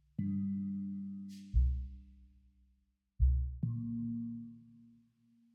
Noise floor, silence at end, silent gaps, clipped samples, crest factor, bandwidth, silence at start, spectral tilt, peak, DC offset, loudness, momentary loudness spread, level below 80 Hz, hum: -76 dBFS; 0.75 s; none; under 0.1%; 18 dB; 5 kHz; 0.2 s; -10 dB/octave; -18 dBFS; under 0.1%; -38 LUFS; 15 LU; -40 dBFS; none